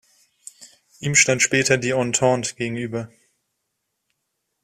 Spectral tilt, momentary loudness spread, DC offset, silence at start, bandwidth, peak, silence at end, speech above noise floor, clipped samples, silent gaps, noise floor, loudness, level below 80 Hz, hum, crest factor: -3 dB/octave; 14 LU; under 0.1%; 0.6 s; 15 kHz; -2 dBFS; 1.55 s; 56 dB; under 0.1%; none; -77 dBFS; -19 LUFS; -60 dBFS; none; 20 dB